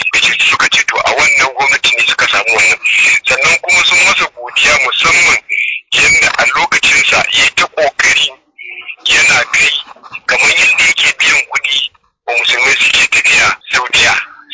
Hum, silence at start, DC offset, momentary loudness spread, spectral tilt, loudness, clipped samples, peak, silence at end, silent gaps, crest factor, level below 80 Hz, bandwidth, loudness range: none; 0 s; under 0.1%; 7 LU; 0.5 dB/octave; -8 LUFS; under 0.1%; -2 dBFS; 0 s; none; 10 dB; -44 dBFS; 8 kHz; 2 LU